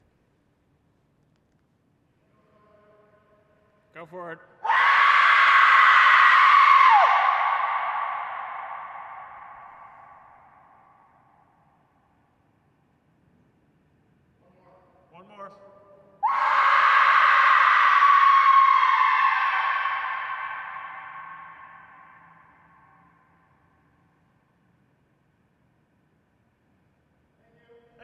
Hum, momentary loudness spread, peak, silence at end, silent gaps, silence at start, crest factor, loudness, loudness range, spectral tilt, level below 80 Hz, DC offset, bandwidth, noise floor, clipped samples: none; 25 LU; -4 dBFS; 6.6 s; none; 3.95 s; 20 dB; -18 LUFS; 20 LU; -0.5 dB/octave; -78 dBFS; under 0.1%; 8.8 kHz; -67 dBFS; under 0.1%